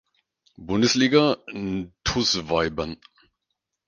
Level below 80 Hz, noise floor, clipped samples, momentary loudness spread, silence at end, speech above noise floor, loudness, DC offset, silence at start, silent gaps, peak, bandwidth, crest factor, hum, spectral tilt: -46 dBFS; -81 dBFS; under 0.1%; 13 LU; 0.9 s; 58 dB; -23 LUFS; under 0.1%; 0.6 s; none; -4 dBFS; 10 kHz; 22 dB; none; -4 dB/octave